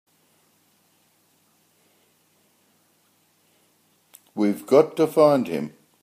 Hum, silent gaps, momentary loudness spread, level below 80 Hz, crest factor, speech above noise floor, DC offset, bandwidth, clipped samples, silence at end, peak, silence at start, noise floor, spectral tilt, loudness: none; none; 15 LU; -76 dBFS; 22 dB; 45 dB; under 0.1%; 15.5 kHz; under 0.1%; 0.35 s; -4 dBFS; 4.35 s; -64 dBFS; -6.5 dB/octave; -20 LUFS